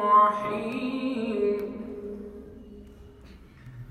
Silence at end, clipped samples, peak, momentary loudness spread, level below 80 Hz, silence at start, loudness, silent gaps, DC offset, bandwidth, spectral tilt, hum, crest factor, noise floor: 0 s; under 0.1%; -10 dBFS; 26 LU; -54 dBFS; 0 s; -27 LUFS; none; under 0.1%; 12 kHz; -7 dB/octave; none; 18 dB; -49 dBFS